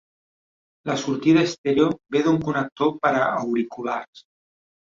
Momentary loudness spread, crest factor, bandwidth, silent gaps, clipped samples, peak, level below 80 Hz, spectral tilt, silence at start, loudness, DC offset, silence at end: 10 LU; 18 dB; 7.6 kHz; 1.58-1.64 s, 2.72-2.76 s, 4.08-4.13 s; under 0.1%; -6 dBFS; -62 dBFS; -6 dB/octave; 0.85 s; -22 LUFS; under 0.1%; 0.7 s